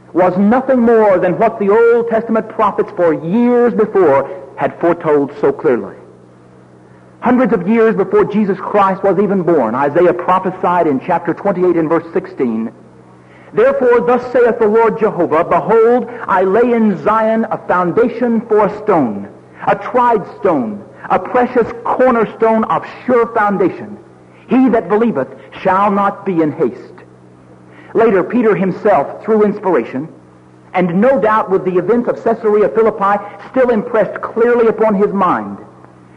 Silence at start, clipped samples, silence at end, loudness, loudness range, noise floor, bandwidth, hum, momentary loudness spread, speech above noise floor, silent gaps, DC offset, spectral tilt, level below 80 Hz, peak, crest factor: 0.15 s; under 0.1%; 0.5 s; -13 LUFS; 3 LU; -42 dBFS; 6.6 kHz; none; 8 LU; 29 dB; none; under 0.1%; -9 dB/octave; -50 dBFS; -2 dBFS; 12 dB